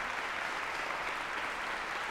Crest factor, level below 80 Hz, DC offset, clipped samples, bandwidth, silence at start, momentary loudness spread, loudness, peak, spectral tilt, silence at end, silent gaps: 14 dB; -62 dBFS; under 0.1%; under 0.1%; 16 kHz; 0 s; 1 LU; -36 LUFS; -22 dBFS; -1.5 dB/octave; 0 s; none